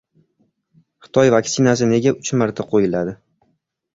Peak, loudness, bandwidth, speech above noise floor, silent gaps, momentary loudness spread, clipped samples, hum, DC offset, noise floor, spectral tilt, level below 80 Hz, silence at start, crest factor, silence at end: -2 dBFS; -17 LUFS; 7.8 kHz; 51 dB; none; 7 LU; under 0.1%; none; under 0.1%; -67 dBFS; -5.5 dB/octave; -54 dBFS; 1.15 s; 18 dB; 0.8 s